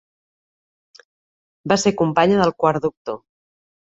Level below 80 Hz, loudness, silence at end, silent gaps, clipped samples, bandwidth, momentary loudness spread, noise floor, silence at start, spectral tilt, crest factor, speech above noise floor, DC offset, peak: -56 dBFS; -18 LUFS; 0.7 s; 2.97-3.05 s; under 0.1%; 8.2 kHz; 16 LU; under -90 dBFS; 1.65 s; -5 dB/octave; 20 dB; over 72 dB; under 0.1%; -2 dBFS